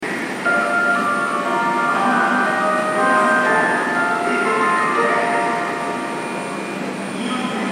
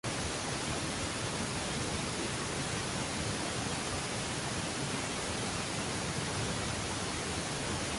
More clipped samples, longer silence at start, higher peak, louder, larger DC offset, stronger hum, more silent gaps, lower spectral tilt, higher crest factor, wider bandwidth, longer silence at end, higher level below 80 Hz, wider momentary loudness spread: neither; about the same, 0 s vs 0.05 s; first, -4 dBFS vs -22 dBFS; first, -18 LUFS vs -35 LUFS; neither; neither; neither; about the same, -4 dB/octave vs -3 dB/octave; about the same, 14 dB vs 14 dB; first, 16 kHz vs 12 kHz; about the same, 0 s vs 0 s; second, -70 dBFS vs -50 dBFS; first, 9 LU vs 1 LU